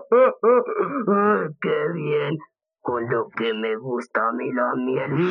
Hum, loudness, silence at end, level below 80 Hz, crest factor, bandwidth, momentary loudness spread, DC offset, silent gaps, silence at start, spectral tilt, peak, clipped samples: none; -22 LUFS; 0 s; -76 dBFS; 16 dB; 6.6 kHz; 9 LU; under 0.1%; none; 0 s; -8 dB/octave; -6 dBFS; under 0.1%